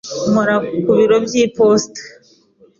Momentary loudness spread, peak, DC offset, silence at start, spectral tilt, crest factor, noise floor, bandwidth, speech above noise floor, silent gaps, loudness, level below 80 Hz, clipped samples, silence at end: 6 LU; -2 dBFS; under 0.1%; 0.05 s; -5 dB/octave; 12 dB; -51 dBFS; 7.6 kHz; 36 dB; none; -14 LUFS; -54 dBFS; under 0.1%; 0.7 s